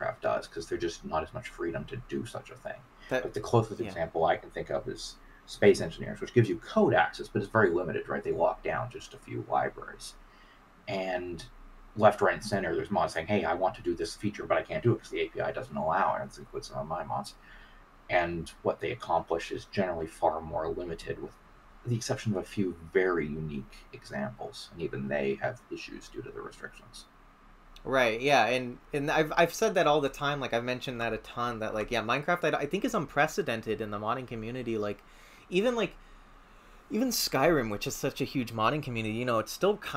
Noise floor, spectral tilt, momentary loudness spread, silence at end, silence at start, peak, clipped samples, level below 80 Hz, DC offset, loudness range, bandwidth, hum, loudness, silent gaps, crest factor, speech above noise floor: -56 dBFS; -5 dB/octave; 16 LU; 0 s; 0 s; -8 dBFS; under 0.1%; -54 dBFS; under 0.1%; 6 LU; 16 kHz; none; -30 LUFS; none; 22 dB; 26 dB